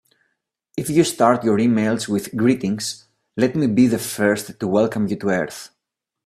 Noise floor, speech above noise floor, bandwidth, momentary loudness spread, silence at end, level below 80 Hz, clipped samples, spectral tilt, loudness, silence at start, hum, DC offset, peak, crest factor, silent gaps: -82 dBFS; 63 dB; 14.5 kHz; 12 LU; 0.6 s; -58 dBFS; under 0.1%; -5.5 dB/octave; -20 LUFS; 0.75 s; none; under 0.1%; 0 dBFS; 20 dB; none